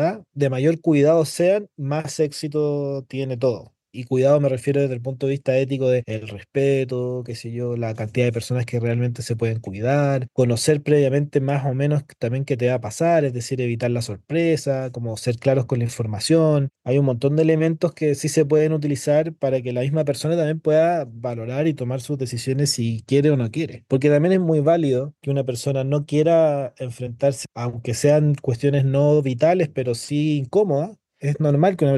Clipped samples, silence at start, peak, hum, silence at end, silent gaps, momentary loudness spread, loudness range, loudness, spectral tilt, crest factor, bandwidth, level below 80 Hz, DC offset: under 0.1%; 0 s; -4 dBFS; none; 0 s; none; 9 LU; 3 LU; -21 LUFS; -6.5 dB/octave; 16 dB; 12.5 kHz; -64 dBFS; under 0.1%